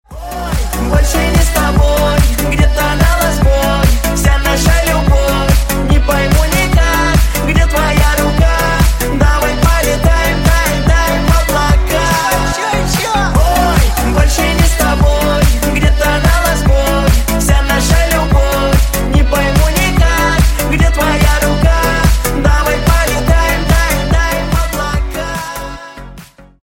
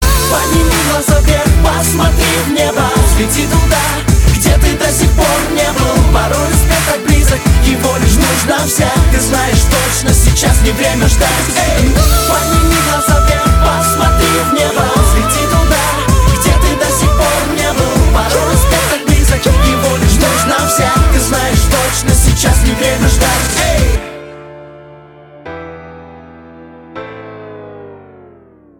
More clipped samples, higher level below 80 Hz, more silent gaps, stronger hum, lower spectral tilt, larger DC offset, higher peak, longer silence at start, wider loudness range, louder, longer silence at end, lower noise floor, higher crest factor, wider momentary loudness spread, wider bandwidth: neither; about the same, -14 dBFS vs -14 dBFS; neither; neither; about the same, -5 dB/octave vs -4 dB/octave; neither; about the same, 0 dBFS vs 0 dBFS; about the same, 0.1 s vs 0 s; second, 1 LU vs 6 LU; about the same, -12 LUFS vs -10 LUFS; second, 0.4 s vs 0.8 s; second, -35 dBFS vs -41 dBFS; about the same, 10 dB vs 10 dB; about the same, 3 LU vs 3 LU; second, 17 kHz vs 19 kHz